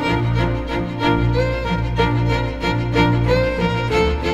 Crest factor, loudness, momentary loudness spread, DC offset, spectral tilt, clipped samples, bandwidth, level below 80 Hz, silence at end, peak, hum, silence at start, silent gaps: 16 dB; -19 LUFS; 4 LU; under 0.1%; -7 dB/octave; under 0.1%; 8.6 kHz; -26 dBFS; 0 s; -2 dBFS; none; 0 s; none